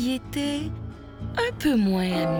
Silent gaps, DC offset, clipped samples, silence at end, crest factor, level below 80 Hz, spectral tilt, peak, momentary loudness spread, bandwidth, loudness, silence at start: none; under 0.1%; under 0.1%; 0 s; 14 dB; -44 dBFS; -6 dB/octave; -12 dBFS; 15 LU; over 20 kHz; -26 LUFS; 0 s